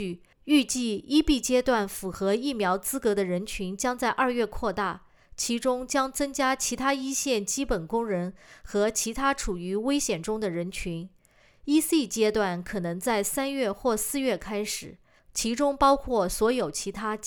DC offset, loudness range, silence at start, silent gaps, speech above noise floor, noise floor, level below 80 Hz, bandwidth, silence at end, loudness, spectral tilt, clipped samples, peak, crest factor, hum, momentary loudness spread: under 0.1%; 2 LU; 0 s; none; 32 dB; -59 dBFS; -46 dBFS; over 20 kHz; 0 s; -27 LUFS; -3.5 dB/octave; under 0.1%; -10 dBFS; 18 dB; none; 9 LU